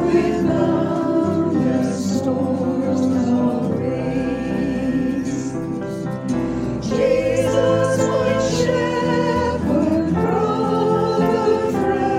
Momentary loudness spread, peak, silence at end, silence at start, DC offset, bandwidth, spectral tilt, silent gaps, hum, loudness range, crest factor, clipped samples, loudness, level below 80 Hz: 5 LU; -4 dBFS; 0 s; 0 s; under 0.1%; 14.5 kHz; -6.5 dB/octave; none; none; 3 LU; 14 dB; under 0.1%; -19 LUFS; -42 dBFS